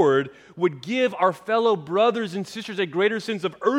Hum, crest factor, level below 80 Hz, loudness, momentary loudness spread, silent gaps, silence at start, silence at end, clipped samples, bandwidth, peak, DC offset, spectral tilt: none; 16 dB; -72 dBFS; -23 LUFS; 8 LU; none; 0 s; 0 s; under 0.1%; 12.5 kHz; -6 dBFS; under 0.1%; -5.5 dB/octave